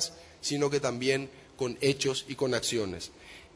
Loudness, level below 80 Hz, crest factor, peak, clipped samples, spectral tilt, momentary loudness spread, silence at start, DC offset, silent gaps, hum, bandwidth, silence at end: -30 LUFS; -62 dBFS; 20 dB; -12 dBFS; under 0.1%; -3.5 dB/octave; 12 LU; 0 s; under 0.1%; none; none; 11 kHz; 0.1 s